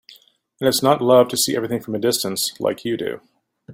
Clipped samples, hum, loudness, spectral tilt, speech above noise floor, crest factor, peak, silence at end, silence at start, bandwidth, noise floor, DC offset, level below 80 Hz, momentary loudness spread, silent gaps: under 0.1%; none; -19 LUFS; -3.5 dB/octave; 33 dB; 18 dB; -2 dBFS; 0 s; 0.1 s; 16.5 kHz; -52 dBFS; under 0.1%; -62 dBFS; 11 LU; none